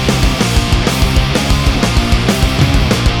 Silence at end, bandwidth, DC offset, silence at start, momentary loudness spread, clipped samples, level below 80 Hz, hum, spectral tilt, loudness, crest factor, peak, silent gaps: 0 s; 18.5 kHz; 0.2%; 0 s; 1 LU; under 0.1%; -16 dBFS; none; -5 dB/octave; -13 LUFS; 12 dB; 0 dBFS; none